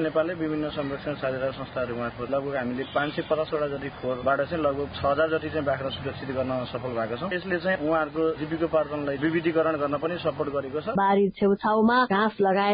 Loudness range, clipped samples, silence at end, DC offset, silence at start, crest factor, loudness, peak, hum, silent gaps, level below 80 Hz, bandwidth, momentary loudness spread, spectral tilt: 5 LU; under 0.1%; 0 s; under 0.1%; 0 s; 14 dB; -26 LUFS; -12 dBFS; none; none; -52 dBFS; 5.2 kHz; 8 LU; -10.5 dB/octave